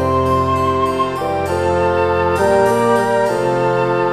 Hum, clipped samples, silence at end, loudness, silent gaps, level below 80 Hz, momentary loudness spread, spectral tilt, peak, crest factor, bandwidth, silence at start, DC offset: none; under 0.1%; 0 s; -16 LUFS; none; -40 dBFS; 4 LU; -6 dB/octave; -2 dBFS; 12 dB; 15.5 kHz; 0 s; 0.4%